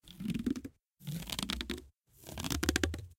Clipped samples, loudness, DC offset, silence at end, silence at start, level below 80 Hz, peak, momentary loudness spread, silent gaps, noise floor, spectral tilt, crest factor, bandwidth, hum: under 0.1%; -37 LUFS; under 0.1%; 0.05 s; 0.05 s; -48 dBFS; -10 dBFS; 17 LU; none; -57 dBFS; -4 dB/octave; 28 dB; 17 kHz; none